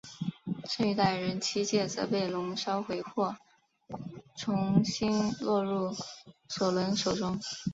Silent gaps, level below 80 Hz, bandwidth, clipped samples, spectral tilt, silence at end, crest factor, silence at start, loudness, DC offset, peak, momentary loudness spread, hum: none; -64 dBFS; 8 kHz; under 0.1%; -5 dB/octave; 0 s; 20 dB; 0.05 s; -31 LUFS; under 0.1%; -10 dBFS; 15 LU; none